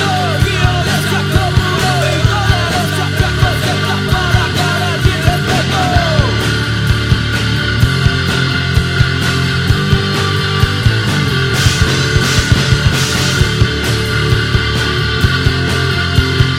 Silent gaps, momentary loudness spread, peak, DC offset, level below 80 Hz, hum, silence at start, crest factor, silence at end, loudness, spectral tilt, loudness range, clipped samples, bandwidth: none; 2 LU; 0 dBFS; under 0.1%; -22 dBFS; none; 0 s; 12 dB; 0 s; -13 LUFS; -4.5 dB/octave; 1 LU; under 0.1%; 16 kHz